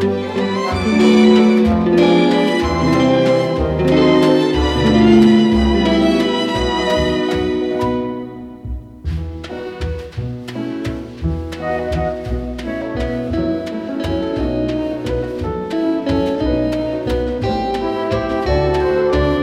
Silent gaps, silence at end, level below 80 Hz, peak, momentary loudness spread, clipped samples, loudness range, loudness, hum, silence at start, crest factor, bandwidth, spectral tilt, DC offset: none; 0 s; -30 dBFS; 0 dBFS; 14 LU; under 0.1%; 11 LU; -16 LUFS; none; 0 s; 16 dB; 12 kHz; -6.5 dB/octave; under 0.1%